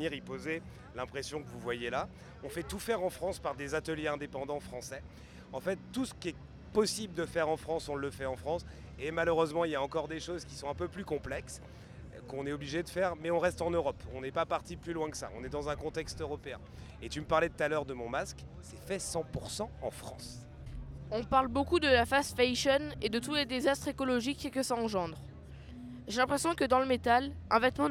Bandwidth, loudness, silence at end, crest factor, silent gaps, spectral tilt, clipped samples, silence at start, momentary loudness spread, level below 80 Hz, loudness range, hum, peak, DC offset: 16.5 kHz; -34 LUFS; 0 s; 20 dB; none; -4.5 dB/octave; under 0.1%; 0 s; 18 LU; -52 dBFS; 8 LU; none; -14 dBFS; under 0.1%